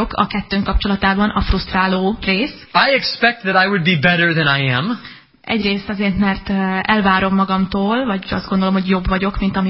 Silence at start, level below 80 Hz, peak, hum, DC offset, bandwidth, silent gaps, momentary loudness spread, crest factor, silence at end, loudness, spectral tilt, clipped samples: 0 s; -30 dBFS; 0 dBFS; none; 0.1%; 5.8 kHz; none; 6 LU; 16 dB; 0 s; -16 LUFS; -10 dB/octave; under 0.1%